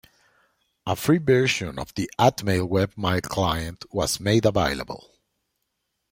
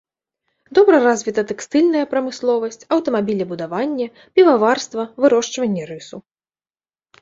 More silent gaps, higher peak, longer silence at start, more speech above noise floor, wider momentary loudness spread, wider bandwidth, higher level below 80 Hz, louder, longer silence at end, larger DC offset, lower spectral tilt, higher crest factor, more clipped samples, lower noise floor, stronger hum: neither; about the same, -4 dBFS vs -2 dBFS; first, 0.85 s vs 0.7 s; second, 54 dB vs over 73 dB; about the same, 11 LU vs 12 LU; first, 16.5 kHz vs 7.8 kHz; first, -48 dBFS vs -64 dBFS; second, -23 LUFS vs -18 LUFS; first, 1.15 s vs 1 s; neither; about the same, -5 dB/octave vs -5 dB/octave; about the same, 20 dB vs 16 dB; neither; second, -77 dBFS vs under -90 dBFS; neither